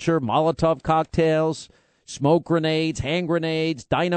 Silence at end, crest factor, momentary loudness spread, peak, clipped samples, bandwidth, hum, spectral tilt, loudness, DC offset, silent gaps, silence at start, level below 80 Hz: 0 s; 18 dB; 5 LU; -4 dBFS; under 0.1%; 8.8 kHz; none; -6 dB/octave; -22 LUFS; under 0.1%; none; 0 s; -48 dBFS